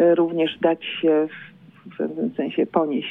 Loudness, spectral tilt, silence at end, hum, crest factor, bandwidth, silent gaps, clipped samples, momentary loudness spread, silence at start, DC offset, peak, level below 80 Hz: -22 LUFS; -8.5 dB/octave; 0 s; none; 16 dB; 3.9 kHz; none; under 0.1%; 10 LU; 0 s; under 0.1%; -6 dBFS; -70 dBFS